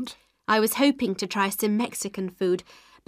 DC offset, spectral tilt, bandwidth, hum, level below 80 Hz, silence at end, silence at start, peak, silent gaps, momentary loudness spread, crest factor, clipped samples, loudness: under 0.1%; -4 dB/octave; 15.5 kHz; none; -66 dBFS; 0.45 s; 0 s; -8 dBFS; none; 9 LU; 18 dB; under 0.1%; -25 LUFS